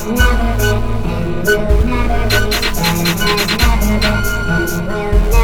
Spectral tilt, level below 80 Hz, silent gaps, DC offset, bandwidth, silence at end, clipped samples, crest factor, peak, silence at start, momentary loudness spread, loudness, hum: -4.5 dB/octave; -16 dBFS; none; under 0.1%; 19 kHz; 0 s; under 0.1%; 12 dB; 0 dBFS; 0 s; 5 LU; -15 LUFS; none